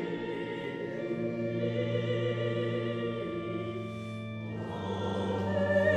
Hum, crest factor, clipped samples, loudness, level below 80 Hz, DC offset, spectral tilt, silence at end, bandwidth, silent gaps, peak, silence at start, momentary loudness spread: none; 16 dB; under 0.1%; -33 LUFS; -56 dBFS; under 0.1%; -7.5 dB/octave; 0 s; 9.6 kHz; none; -16 dBFS; 0 s; 7 LU